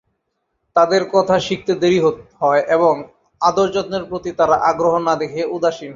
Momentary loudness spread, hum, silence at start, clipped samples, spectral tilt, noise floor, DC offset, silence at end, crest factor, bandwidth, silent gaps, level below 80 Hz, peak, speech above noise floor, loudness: 7 LU; none; 0.75 s; under 0.1%; -5.5 dB/octave; -72 dBFS; under 0.1%; 0 s; 16 dB; 7.6 kHz; none; -54 dBFS; -2 dBFS; 55 dB; -17 LUFS